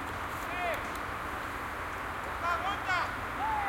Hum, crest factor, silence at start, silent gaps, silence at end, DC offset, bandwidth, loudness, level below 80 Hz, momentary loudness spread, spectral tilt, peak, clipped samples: none; 16 dB; 0 s; none; 0 s; under 0.1%; 16.5 kHz; -34 LUFS; -50 dBFS; 6 LU; -4 dB/octave; -18 dBFS; under 0.1%